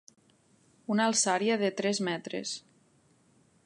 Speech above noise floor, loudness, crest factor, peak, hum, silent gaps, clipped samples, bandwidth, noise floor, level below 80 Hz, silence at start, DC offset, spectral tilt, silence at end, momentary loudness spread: 37 dB; -29 LUFS; 18 dB; -14 dBFS; none; none; under 0.1%; 11.5 kHz; -66 dBFS; -84 dBFS; 0.9 s; under 0.1%; -3 dB/octave; 1.05 s; 13 LU